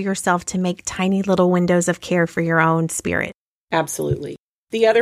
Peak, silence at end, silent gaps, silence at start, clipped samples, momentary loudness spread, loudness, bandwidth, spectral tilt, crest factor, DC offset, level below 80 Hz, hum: -4 dBFS; 0 s; 3.38-3.67 s, 4.40-4.67 s; 0 s; under 0.1%; 7 LU; -20 LUFS; 15 kHz; -5 dB/octave; 16 dB; under 0.1%; -50 dBFS; none